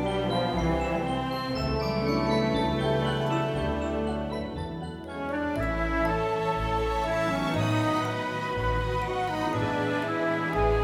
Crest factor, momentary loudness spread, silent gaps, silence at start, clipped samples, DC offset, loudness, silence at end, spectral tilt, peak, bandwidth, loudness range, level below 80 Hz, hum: 16 dB; 5 LU; none; 0 s; under 0.1%; under 0.1%; -28 LUFS; 0 s; -6.5 dB/octave; -12 dBFS; 16 kHz; 2 LU; -38 dBFS; none